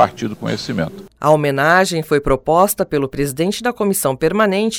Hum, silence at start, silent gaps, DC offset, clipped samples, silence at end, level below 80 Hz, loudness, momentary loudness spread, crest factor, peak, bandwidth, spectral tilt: none; 0 s; none; under 0.1%; under 0.1%; 0 s; -38 dBFS; -17 LUFS; 9 LU; 16 dB; 0 dBFS; 19.5 kHz; -4.5 dB/octave